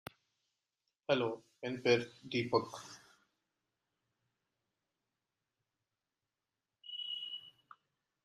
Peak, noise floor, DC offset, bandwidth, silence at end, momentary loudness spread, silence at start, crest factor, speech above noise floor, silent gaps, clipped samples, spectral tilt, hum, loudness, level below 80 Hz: -16 dBFS; under -90 dBFS; under 0.1%; 14.5 kHz; 0.75 s; 22 LU; 1.1 s; 26 dB; over 55 dB; none; under 0.1%; -5 dB/octave; none; -37 LUFS; -82 dBFS